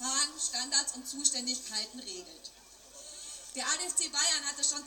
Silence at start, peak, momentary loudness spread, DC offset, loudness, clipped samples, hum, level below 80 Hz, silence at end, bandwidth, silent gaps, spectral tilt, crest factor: 0 s; -10 dBFS; 20 LU; under 0.1%; -30 LUFS; under 0.1%; none; -70 dBFS; 0 s; 17 kHz; none; 2 dB/octave; 26 dB